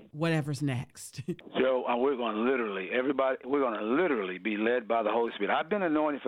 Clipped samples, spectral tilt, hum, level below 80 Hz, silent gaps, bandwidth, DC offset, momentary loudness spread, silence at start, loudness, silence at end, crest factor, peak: under 0.1%; -6 dB/octave; none; -68 dBFS; none; 15.5 kHz; under 0.1%; 6 LU; 0 s; -30 LUFS; 0 s; 16 dB; -12 dBFS